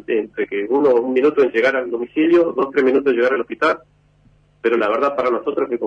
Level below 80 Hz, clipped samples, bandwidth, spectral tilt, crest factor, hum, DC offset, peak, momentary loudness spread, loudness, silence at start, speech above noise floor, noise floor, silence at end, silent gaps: -60 dBFS; under 0.1%; 7.6 kHz; -6 dB/octave; 12 dB; 50 Hz at -60 dBFS; under 0.1%; -6 dBFS; 7 LU; -18 LUFS; 0.1 s; 37 dB; -54 dBFS; 0 s; none